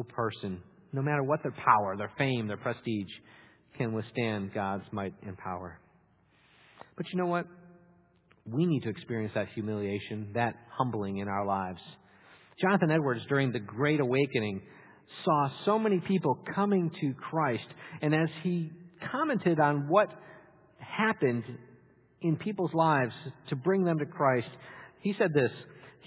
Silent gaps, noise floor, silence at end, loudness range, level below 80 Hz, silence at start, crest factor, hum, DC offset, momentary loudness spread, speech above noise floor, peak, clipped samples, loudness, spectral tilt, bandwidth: none; -66 dBFS; 0.15 s; 7 LU; -66 dBFS; 0 s; 22 dB; none; under 0.1%; 15 LU; 36 dB; -10 dBFS; under 0.1%; -31 LUFS; -6 dB/octave; 4 kHz